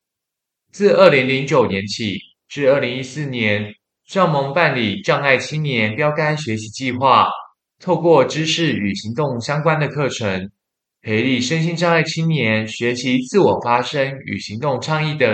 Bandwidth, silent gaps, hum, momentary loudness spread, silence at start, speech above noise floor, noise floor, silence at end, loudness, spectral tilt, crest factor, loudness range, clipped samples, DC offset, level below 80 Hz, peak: 9 kHz; none; none; 11 LU; 0.75 s; 65 dB; -82 dBFS; 0 s; -17 LUFS; -5.5 dB/octave; 18 dB; 2 LU; under 0.1%; under 0.1%; -62 dBFS; 0 dBFS